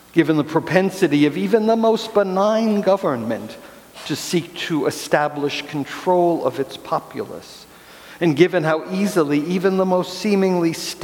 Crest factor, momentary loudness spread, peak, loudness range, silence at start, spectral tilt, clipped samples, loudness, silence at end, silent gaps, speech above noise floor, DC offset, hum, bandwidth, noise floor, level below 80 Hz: 20 dB; 11 LU; 0 dBFS; 4 LU; 0.15 s; -5.5 dB/octave; under 0.1%; -19 LUFS; 0 s; none; 23 dB; under 0.1%; none; 18 kHz; -42 dBFS; -62 dBFS